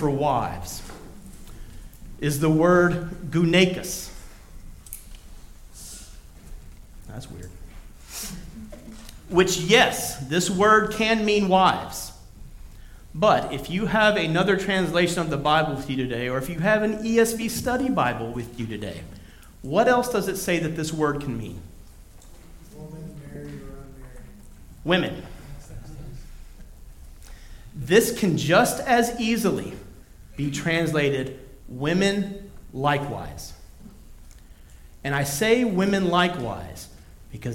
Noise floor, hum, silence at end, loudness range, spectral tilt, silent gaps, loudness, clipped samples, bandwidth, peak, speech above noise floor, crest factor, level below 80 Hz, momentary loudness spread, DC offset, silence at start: -46 dBFS; none; 0 s; 16 LU; -4.5 dB/octave; none; -22 LUFS; under 0.1%; 17 kHz; -4 dBFS; 24 dB; 22 dB; -44 dBFS; 23 LU; under 0.1%; 0 s